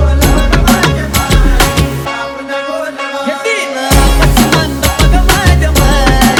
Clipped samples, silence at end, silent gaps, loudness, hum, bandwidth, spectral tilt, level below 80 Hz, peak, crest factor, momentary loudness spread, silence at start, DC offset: 1%; 0 s; none; -11 LUFS; none; 19.5 kHz; -4.5 dB/octave; -12 dBFS; 0 dBFS; 10 dB; 9 LU; 0 s; under 0.1%